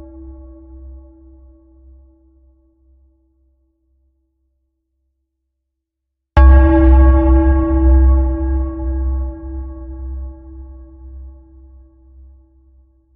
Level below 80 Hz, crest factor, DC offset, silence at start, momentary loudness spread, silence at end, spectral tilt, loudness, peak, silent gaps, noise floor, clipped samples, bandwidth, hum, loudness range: -18 dBFS; 16 dB; under 0.1%; 0 s; 27 LU; 1.85 s; -9.5 dB/octave; -13 LUFS; 0 dBFS; none; -78 dBFS; under 0.1%; 3.1 kHz; none; 21 LU